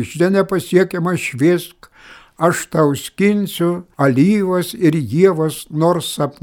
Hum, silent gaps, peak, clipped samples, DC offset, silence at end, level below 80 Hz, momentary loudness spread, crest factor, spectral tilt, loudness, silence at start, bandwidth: none; none; 0 dBFS; under 0.1%; under 0.1%; 0.1 s; -54 dBFS; 6 LU; 16 dB; -6 dB/octave; -16 LUFS; 0 s; 19 kHz